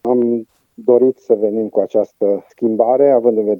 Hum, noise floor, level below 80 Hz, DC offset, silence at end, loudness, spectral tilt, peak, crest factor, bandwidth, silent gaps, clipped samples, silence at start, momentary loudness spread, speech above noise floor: none; -34 dBFS; -70 dBFS; under 0.1%; 0 s; -15 LUFS; -10 dB/octave; 0 dBFS; 14 dB; 6.4 kHz; none; under 0.1%; 0.05 s; 7 LU; 20 dB